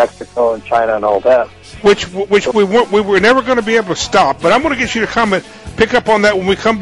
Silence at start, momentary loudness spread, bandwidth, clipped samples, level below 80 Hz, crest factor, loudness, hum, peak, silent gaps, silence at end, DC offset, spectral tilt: 0 s; 5 LU; 11.5 kHz; under 0.1%; -40 dBFS; 12 dB; -13 LUFS; none; 0 dBFS; none; 0 s; 0.2%; -4.5 dB/octave